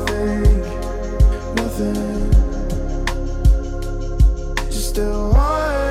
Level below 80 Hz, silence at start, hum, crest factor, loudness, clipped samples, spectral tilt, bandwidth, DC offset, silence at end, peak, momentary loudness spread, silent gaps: -18 dBFS; 0 s; none; 14 dB; -20 LUFS; under 0.1%; -6 dB/octave; 14.5 kHz; under 0.1%; 0 s; -4 dBFS; 8 LU; none